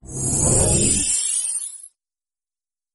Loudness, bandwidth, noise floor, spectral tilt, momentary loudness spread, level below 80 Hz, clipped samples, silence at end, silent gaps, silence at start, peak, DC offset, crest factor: -18 LUFS; 11.5 kHz; under -90 dBFS; -3 dB/octave; 9 LU; -34 dBFS; under 0.1%; 1.05 s; none; 0.05 s; -4 dBFS; under 0.1%; 18 dB